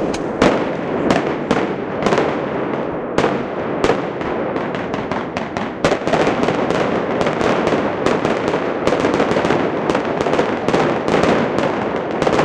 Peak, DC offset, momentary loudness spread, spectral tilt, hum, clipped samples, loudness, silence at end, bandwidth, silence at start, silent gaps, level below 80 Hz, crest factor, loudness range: 0 dBFS; under 0.1%; 6 LU; -6 dB/octave; none; under 0.1%; -18 LUFS; 0 s; 11.5 kHz; 0 s; none; -42 dBFS; 16 dB; 3 LU